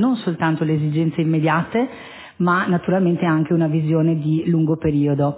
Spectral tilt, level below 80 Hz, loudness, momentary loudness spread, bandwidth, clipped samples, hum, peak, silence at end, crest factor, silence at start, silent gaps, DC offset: -12 dB/octave; -50 dBFS; -19 LUFS; 5 LU; 4 kHz; under 0.1%; none; -6 dBFS; 0 s; 12 dB; 0 s; none; under 0.1%